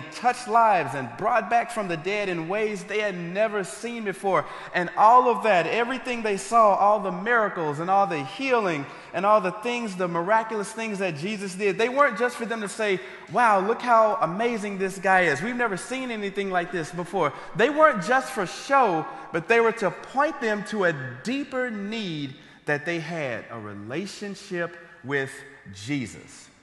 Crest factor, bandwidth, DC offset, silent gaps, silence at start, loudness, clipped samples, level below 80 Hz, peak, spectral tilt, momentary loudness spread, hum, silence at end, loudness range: 20 dB; 12.5 kHz; under 0.1%; none; 0 s; -24 LUFS; under 0.1%; -66 dBFS; -4 dBFS; -5 dB/octave; 12 LU; none; 0.15 s; 9 LU